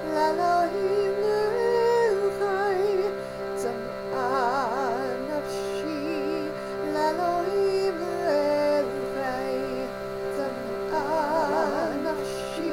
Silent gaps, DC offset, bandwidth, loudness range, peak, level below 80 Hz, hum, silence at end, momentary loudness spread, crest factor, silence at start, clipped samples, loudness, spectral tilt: none; under 0.1%; 16.5 kHz; 4 LU; -12 dBFS; -54 dBFS; none; 0 s; 8 LU; 14 dB; 0 s; under 0.1%; -26 LUFS; -5 dB/octave